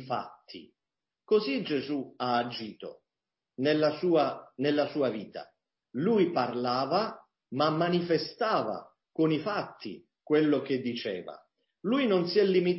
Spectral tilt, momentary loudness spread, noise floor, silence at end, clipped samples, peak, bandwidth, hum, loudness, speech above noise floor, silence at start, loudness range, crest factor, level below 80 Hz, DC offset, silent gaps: -9.5 dB/octave; 18 LU; under -90 dBFS; 0 s; under 0.1%; -14 dBFS; 5.8 kHz; none; -29 LUFS; over 61 dB; 0 s; 2 LU; 16 dB; -74 dBFS; under 0.1%; none